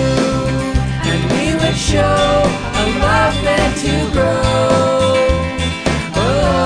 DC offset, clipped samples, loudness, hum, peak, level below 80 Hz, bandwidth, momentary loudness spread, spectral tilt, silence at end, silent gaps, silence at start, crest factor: 0.3%; under 0.1%; -15 LUFS; none; 0 dBFS; -26 dBFS; 10.5 kHz; 4 LU; -5 dB/octave; 0 s; none; 0 s; 14 dB